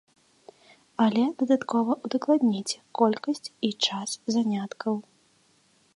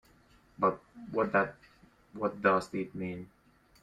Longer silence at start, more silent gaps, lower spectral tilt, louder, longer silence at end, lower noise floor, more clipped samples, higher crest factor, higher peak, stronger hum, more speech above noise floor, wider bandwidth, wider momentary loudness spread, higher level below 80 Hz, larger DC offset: first, 1 s vs 0.6 s; neither; second, -4.5 dB/octave vs -7 dB/octave; first, -26 LUFS vs -32 LUFS; first, 0.95 s vs 0.55 s; about the same, -64 dBFS vs -63 dBFS; neither; about the same, 18 dB vs 22 dB; first, -8 dBFS vs -12 dBFS; neither; first, 38 dB vs 32 dB; about the same, 11.5 kHz vs 12 kHz; second, 8 LU vs 17 LU; second, -78 dBFS vs -66 dBFS; neither